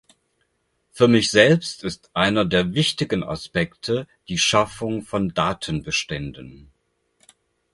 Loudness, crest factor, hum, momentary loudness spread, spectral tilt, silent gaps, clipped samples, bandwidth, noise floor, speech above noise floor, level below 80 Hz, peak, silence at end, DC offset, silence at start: -21 LUFS; 22 dB; none; 13 LU; -4.5 dB/octave; none; under 0.1%; 11.5 kHz; -70 dBFS; 49 dB; -48 dBFS; 0 dBFS; 1.15 s; under 0.1%; 0.95 s